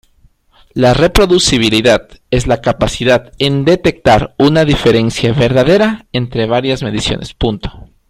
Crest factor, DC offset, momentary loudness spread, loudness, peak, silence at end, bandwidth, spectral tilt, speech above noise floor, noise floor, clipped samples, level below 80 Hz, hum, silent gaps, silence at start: 12 dB; under 0.1%; 8 LU; -12 LUFS; 0 dBFS; 0.25 s; 15.5 kHz; -5 dB/octave; 38 dB; -50 dBFS; under 0.1%; -28 dBFS; none; none; 0.75 s